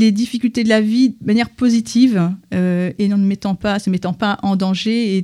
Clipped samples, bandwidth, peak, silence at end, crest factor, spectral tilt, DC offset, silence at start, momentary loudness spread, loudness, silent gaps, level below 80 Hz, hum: under 0.1%; 12 kHz; -2 dBFS; 0 s; 14 dB; -6 dB/octave; under 0.1%; 0 s; 5 LU; -17 LUFS; none; -50 dBFS; none